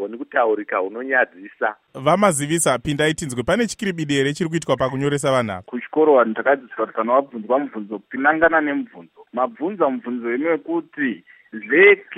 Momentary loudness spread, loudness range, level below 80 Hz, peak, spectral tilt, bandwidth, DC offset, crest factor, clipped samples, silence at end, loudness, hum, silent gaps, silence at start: 11 LU; 2 LU; -54 dBFS; -2 dBFS; -4.5 dB/octave; 16 kHz; under 0.1%; 18 dB; under 0.1%; 0 s; -20 LUFS; none; none; 0 s